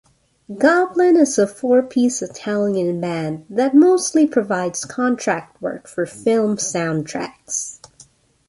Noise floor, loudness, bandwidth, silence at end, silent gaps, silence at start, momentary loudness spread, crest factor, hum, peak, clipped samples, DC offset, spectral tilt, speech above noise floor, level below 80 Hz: -51 dBFS; -18 LUFS; 11.5 kHz; 0.75 s; none; 0.5 s; 12 LU; 16 dB; none; -2 dBFS; under 0.1%; under 0.1%; -4.5 dB/octave; 33 dB; -62 dBFS